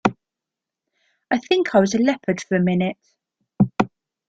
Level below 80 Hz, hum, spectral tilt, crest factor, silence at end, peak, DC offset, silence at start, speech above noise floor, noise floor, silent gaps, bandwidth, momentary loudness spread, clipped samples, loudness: -56 dBFS; none; -6 dB/octave; 20 dB; 0.45 s; -2 dBFS; under 0.1%; 0.05 s; 67 dB; -86 dBFS; none; 7.8 kHz; 8 LU; under 0.1%; -21 LUFS